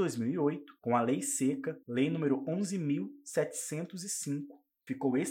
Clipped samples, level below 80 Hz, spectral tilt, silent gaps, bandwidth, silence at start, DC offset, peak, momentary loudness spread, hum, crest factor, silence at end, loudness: under 0.1%; -86 dBFS; -5.5 dB/octave; none; 16.5 kHz; 0 s; under 0.1%; -16 dBFS; 8 LU; none; 18 dB; 0 s; -34 LUFS